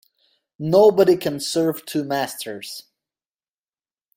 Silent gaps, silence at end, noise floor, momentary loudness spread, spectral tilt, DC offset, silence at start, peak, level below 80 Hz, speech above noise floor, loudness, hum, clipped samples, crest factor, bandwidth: none; 1.35 s; under -90 dBFS; 18 LU; -5 dB/octave; under 0.1%; 0.6 s; -4 dBFS; -64 dBFS; over 71 dB; -19 LUFS; none; under 0.1%; 18 dB; 16.5 kHz